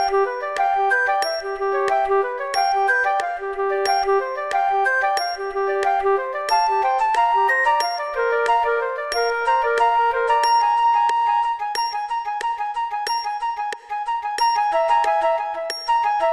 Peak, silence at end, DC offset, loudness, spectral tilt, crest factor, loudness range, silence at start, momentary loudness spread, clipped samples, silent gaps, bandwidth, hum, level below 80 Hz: -6 dBFS; 0 s; 0.2%; -20 LUFS; -1 dB/octave; 14 dB; 3 LU; 0 s; 7 LU; under 0.1%; none; 13 kHz; none; -54 dBFS